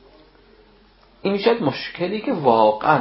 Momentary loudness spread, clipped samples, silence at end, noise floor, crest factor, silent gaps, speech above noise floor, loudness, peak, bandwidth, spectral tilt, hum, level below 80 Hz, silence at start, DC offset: 10 LU; under 0.1%; 0 s; -53 dBFS; 20 dB; none; 34 dB; -20 LUFS; -2 dBFS; 5.8 kHz; -10 dB/octave; none; -56 dBFS; 1.25 s; under 0.1%